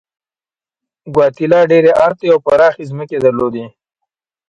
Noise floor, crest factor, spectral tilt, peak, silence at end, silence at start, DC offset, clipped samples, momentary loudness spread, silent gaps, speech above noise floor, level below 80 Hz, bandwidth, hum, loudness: under -90 dBFS; 14 dB; -7.5 dB/octave; 0 dBFS; 0.8 s; 1.05 s; under 0.1%; under 0.1%; 11 LU; none; over 79 dB; -52 dBFS; 7.6 kHz; none; -12 LUFS